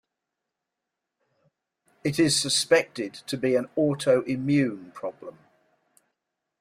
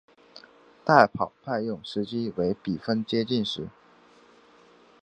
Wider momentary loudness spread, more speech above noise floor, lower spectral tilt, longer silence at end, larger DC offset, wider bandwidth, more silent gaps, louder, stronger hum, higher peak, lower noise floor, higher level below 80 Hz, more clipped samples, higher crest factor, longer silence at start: about the same, 15 LU vs 13 LU; first, 60 dB vs 31 dB; second, -4 dB/octave vs -6.5 dB/octave; about the same, 1.3 s vs 1.35 s; neither; first, 15.5 kHz vs 9.4 kHz; neither; about the same, -24 LUFS vs -26 LUFS; neither; second, -6 dBFS vs 0 dBFS; first, -85 dBFS vs -56 dBFS; about the same, -66 dBFS vs -62 dBFS; neither; second, 20 dB vs 26 dB; first, 2.05 s vs 0.35 s